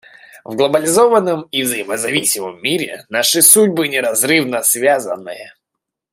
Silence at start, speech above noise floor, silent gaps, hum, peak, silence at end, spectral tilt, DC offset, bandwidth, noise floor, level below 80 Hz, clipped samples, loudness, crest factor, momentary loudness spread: 0.35 s; 64 dB; none; none; 0 dBFS; 0.65 s; -2 dB/octave; under 0.1%; 16 kHz; -79 dBFS; -64 dBFS; under 0.1%; -13 LUFS; 16 dB; 12 LU